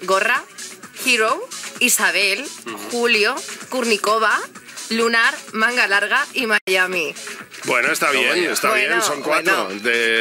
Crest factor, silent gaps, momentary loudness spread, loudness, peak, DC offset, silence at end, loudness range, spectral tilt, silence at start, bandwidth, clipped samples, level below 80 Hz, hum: 14 dB; 6.61-6.67 s; 14 LU; -17 LUFS; -4 dBFS; under 0.1%; 0 s; 1 LU; -1 dB/octave; 0 s; 16 kHz; under 0.1%; -80 dBFS; none